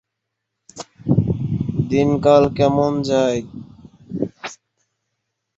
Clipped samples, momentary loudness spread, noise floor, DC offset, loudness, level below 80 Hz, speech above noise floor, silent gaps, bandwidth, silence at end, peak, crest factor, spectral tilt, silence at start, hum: under 0.1%; 21 LU; -79 dBFS; under 0.1%; -18 LUFS; -44 dBFS; 63 dB; none; 8 kHz; 1.05 s; -2 dBFS; 18 dB; -7.5 dB/octave; 0.75 s; none